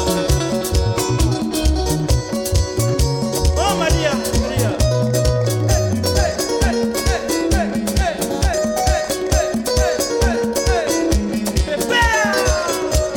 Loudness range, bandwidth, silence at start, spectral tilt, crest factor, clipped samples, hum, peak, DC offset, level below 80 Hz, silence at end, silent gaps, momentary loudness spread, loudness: 1 LU; 18 kHz; 0 s; -4.5 dB/octave; 14 dB; under 0.1%; none; -2 dBFS; under 0.1%; -24 dBFS; 0 s; none; 3 LU; -18 LUFS